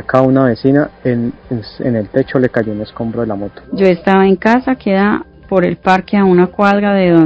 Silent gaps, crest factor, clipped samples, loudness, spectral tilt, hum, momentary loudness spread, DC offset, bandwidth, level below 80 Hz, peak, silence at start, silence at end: none; 12 dB; 0.4%; -13 LUFS; -8.5 dB/octave; none; 10 LU; under 0.1%; 8 kHz; -42 dBFS; 0 dBFS; 0 s; 0 s